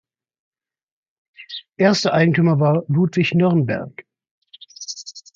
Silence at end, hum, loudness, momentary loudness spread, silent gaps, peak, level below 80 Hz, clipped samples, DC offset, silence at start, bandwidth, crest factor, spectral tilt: 0.15 s; none; -17 LUFS; 18 LU; 4.31-4.41 s; -2 dBFS; -62 dBFS; under 0.1%; under 0.1%; 1.4 s; 7.6 kHz; 18 dB; -6.5 dB/octave